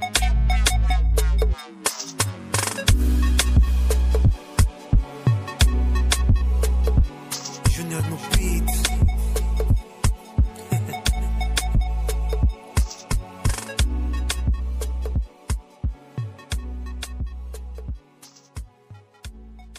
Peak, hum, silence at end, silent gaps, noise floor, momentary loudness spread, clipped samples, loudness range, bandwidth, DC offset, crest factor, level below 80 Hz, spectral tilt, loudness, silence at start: -6 dBFS; none; 0 s; none; -50 dBFS; 13 LU; under 0.1%; 11 LU; 15.5 kHz; under 0.1%; 16 dB; -22 dBFS; -4.5 dB/octave; -23 LUFS; 0 s